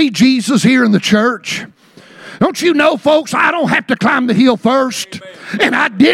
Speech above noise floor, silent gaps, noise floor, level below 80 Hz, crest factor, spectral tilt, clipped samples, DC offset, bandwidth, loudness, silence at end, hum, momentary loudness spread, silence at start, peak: 28 dB; none; -40 dBFS; -54 dBFS; 12 dB; -4.5 dB/octave; under 0.1%; under 0.1%; 14.5 kHz; -12 LUFS; 0 s; none; 11 LU; 0 s; 0 dBFS